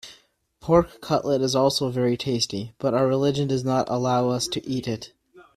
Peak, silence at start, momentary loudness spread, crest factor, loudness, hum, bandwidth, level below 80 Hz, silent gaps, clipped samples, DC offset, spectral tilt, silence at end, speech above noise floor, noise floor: -4 dBFS; 0.05 s; 8 LU; 20 dB; -23 LUFS; none; 14.5 kHz; -52 dBFS; none; under 0.1%; under 0.1%; -5.5 dB/octave; 0.15 s; 36 dB; -59 dBFS